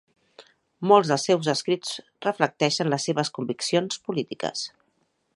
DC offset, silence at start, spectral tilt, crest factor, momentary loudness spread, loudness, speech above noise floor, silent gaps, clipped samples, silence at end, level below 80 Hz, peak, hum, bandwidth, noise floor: under 0.1%; 0.4 s; -4.5 dB/octave; 22 dB; 11 LU; -24 LUFS; 47 dB; none; under 0.1%; 0.7 s; -72 dBFS; -2 dBFS; none; 11.5 kHz; -71 dBFS